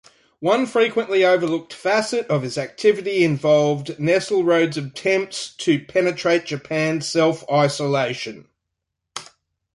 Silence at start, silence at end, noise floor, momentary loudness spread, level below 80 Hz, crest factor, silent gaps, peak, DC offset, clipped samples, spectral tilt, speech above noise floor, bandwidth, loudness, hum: 0.4 s; 0.5 s; -80 dBFS; 9 LU; -64 dBFS; 16 dB; none; -4 dBFS; under 0.1%; under 0.1%; -5 dB/octave; 60 dB; 11.5 kHz; -20 LUFS; none